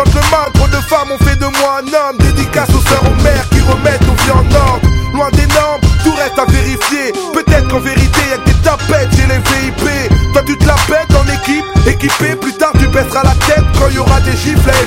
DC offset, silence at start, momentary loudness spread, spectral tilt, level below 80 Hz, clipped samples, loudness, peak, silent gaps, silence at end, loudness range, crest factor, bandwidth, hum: under 0.1%; 0 s; 3 LU; -5 dB/octave; -14 dBFS; 0.2%; -10 LUFS; 0 dBFS; none; 0 s; 1 LU; 10 dB; 16.5 kHz; none